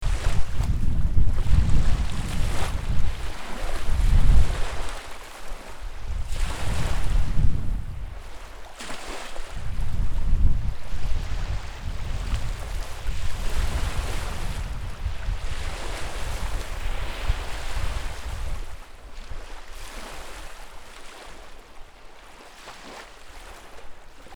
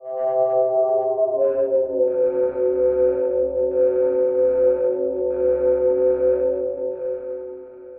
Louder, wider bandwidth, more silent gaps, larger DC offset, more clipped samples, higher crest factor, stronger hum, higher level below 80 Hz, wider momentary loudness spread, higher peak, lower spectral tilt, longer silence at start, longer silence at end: second, -30 LUFS vs -20 LUFS; first, 12 kHz vs 2.7 kHz; neither; neither; neither; first, 18 dB vs 12 dB; neither; first, -26 dBFS vs -50 dBFS; first, 18 LU vs 8 LU; first, -4 dBFS vs -8 dBFS; second, -5 dB/octave vs -9 dB/octave; about the same, 0 s vs 0 s; about the same, 0 s vs 0 s